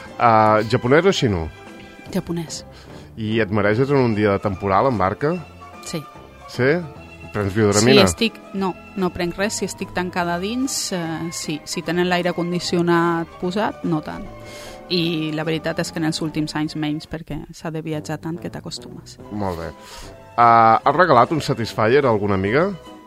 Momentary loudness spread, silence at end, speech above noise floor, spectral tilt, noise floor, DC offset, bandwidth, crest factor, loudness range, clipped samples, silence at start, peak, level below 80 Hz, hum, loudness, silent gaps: 19 LU; 0.05 s; 19 dB; -5 dB/octave; -39 dBFS; under 0.1%; 15.5 kHz; 20 dB; 8 LU; under 0.1%; 0 s; 0 dBFS; -46 dBFS; none; -20 LUFS; none